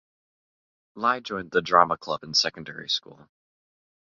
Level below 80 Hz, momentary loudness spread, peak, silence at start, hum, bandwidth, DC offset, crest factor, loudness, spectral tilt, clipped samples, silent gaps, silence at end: -64 dBFS; 9 LU; -2 dBFS; 0.95 s; none; 7.6 kHz; under 0.1%; 26 dB; -24 LUFS; -2.5 dB/octave; under 0.1%; none; 1 s